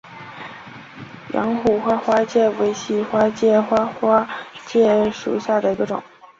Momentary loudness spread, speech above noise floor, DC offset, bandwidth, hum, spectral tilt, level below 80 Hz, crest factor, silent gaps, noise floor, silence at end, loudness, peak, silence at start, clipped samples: 19 LU; 20 dB; under 0.1%; 7.6 kHz; none; -5.5 dB/octave; -56 dBFS; 16 dB; none; -38 dBFS; 0.35 s; -19 LUFS; -2 dBFS; 0.05 s; under 0.1%